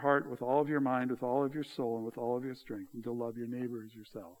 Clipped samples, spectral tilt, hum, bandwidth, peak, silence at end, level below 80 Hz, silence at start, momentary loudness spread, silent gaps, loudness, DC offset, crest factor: under 0.1%; -7.5 dB/octave; none; 20 kHz; -14 dBFS; 0.05 s; -76 dBFS; 0 s; 13 LU; none; -35 LUFS; under 0.1%; 20 dB